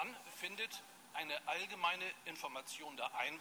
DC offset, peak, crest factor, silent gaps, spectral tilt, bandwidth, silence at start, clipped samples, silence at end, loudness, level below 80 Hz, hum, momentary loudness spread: under 0.1%; -24 dBFS; 20 dB; none; -1 dB/octave; 19 kHz; 0 s; under 0.1%; 0 s; -43 LUFS; under -90 dBFS; none; 9 LU